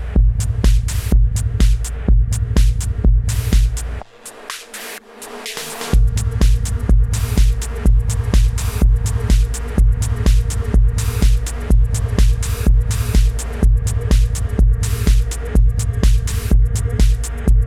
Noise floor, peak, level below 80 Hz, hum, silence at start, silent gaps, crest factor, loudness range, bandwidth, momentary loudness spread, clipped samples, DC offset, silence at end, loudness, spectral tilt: -36 dBFS; -2 dBFS; -16 dBFS; none; 0 s; none; 12 dB; 3 LU; 15 kHz; 9 LU; under 0.1%; under 0.1%; 0 s; -18 LUFS; -5.5 dB/octave